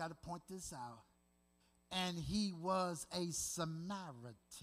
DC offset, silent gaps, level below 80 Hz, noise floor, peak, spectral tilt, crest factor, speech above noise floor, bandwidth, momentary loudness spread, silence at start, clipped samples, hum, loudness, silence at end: under 0.1%; none; -66 dBFS; -76 dBFS; -26 dBFS; -4 dB/octave; 18 dB; 33 dB; 15.5 kHz; 14 LU; 0 s; under 0.1%; none; -43 LUFS; 0 s